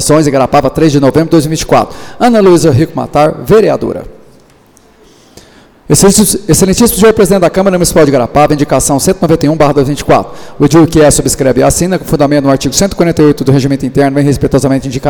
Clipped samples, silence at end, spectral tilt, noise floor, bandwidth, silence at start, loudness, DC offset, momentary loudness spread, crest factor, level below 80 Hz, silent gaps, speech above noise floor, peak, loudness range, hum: 0.3%; 0 s; -5 dB/octave; -43 dBFS; 19.5 kHz; 0 s; -8 LUFS; under 0.1%; 6 LU; 8 dB; -28 dBFS; none; 35 dB; 0 dBFS; 4 LU; none